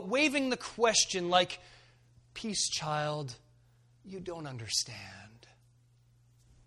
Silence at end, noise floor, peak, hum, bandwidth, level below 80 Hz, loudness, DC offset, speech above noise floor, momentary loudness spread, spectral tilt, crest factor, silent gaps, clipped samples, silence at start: 1.3 s; -65 dBFS; -12 dBFS; none; 13.5 kHz; -66 dBFS; -31 LUFS; under 0.1%; 33 dB; 20 LU; -2.5 dB/octave; 22 dB; none; under 0.1%; 0 s